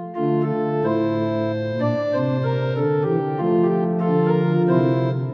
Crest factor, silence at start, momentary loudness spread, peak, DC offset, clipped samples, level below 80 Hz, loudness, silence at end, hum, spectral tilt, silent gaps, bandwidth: 14 dB; 0 s; 4 LU; -4 dBFS; under 0.1%; under 0.1%; -66 dBFS; -21 LUFS; 0 s; none; -10 dB/octave; none; 6 kHz